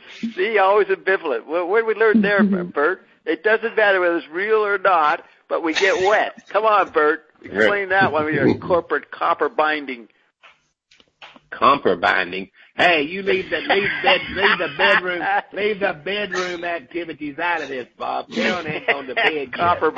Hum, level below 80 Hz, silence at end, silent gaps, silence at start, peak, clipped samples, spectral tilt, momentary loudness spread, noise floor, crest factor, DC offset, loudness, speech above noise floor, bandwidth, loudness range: none; -58 dBFS; 0 s; none; 0.05 s; -2 dBFS; under 0.1%; -5 dB/octave; 11 LU; -58 dBFS; 18 dB; under 0.1%; -19 LUFS; 38 dB; 8.2 kHz; 5 LU